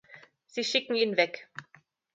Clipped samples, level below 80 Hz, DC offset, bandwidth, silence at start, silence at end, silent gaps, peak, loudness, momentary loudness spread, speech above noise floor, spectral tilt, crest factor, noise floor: under 0.1%; -82 dBFS; under 0.1%; 9.2 kHz; 0.1 s; 0.55 s; none; -10 dBFS; -28 LUFS; 19 LU; 26 dB; -3 dB/octave; 22 dB; -55 dBFS